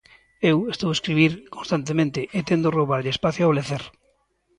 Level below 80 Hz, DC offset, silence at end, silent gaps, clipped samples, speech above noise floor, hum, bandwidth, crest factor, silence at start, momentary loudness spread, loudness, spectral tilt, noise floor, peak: -56 dBFS; under 0.1%; 0.7 s; none; under 0.1%; 44 dB; none; 11 kHz; 18 dB; 0.4 s; 8 LU; -22 LUFS; -6 dB/octave; -66 dBFS; -4 dBFS